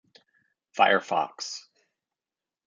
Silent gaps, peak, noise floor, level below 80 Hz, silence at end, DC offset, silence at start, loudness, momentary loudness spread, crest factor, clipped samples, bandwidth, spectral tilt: none; -6 dBFS; under -90 dBFS; -86 dBFS; 1.05 s; under 0.1%; 0.75 s; -25 LUFS; 18 LU; 24 dB; under 0.1%; 8.8 kHz; -2.5 dB/octave